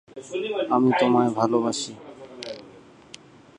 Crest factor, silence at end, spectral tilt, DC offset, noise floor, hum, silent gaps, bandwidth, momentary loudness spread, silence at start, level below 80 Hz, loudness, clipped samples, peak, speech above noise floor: 18 dB; 0.9 s; -5 dB/octave; under 0.1%; -49 dBFS; none; none; 10.5 kHz; 20 LU; 0.15 s; -68 dBFS; -23 LUFS; under 0.1%; -6 dBFS; 26 dB